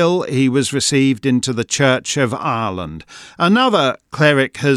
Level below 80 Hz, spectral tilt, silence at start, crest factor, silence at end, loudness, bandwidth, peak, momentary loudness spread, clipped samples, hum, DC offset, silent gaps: -54 dBFS; -4.5 dB/octave; 0 s; 16 dB; 0 s; -16 LUFS; 13.5 kHz; 0 dBFS; 7 LU; under 0.1%; none; under 0.1%; none